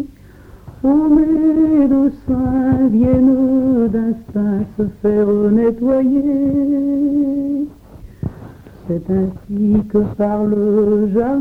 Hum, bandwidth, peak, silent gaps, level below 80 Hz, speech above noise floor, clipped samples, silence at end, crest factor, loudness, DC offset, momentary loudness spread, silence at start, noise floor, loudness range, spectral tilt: none; 3 kHz; -2 dBFS; none; -38 dBFS; 26 dB; under 0.1%; 0 s; 12 dB; -15 LUFS; under 0.1%; 9 LU; 0 s; -40 dBFS; 6 LU; -11 dB/octave